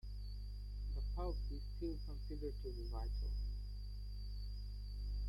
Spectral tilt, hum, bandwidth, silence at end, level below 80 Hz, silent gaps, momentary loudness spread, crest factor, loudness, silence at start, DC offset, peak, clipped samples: -8 dB/octave; 50 Hz at -45 dBFS; 12 kHz; 0 s; -44 dBFS; none; 6 LU; 12 dB; -47 LUFS; 0.05 s; under 0.1%; -32 dBFS; under 0.1%